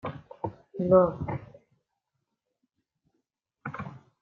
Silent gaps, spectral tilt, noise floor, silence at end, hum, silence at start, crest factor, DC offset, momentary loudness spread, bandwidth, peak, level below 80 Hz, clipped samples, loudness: none; -10.5 dB/octave; -82 dBFS; 0.25 s; none; 0.05 s; 24 dB; under 0.1%; 19 LU; 4.1 kHz; -8 dBFS; -60 dBFS; under 0.1%; -27 LUFS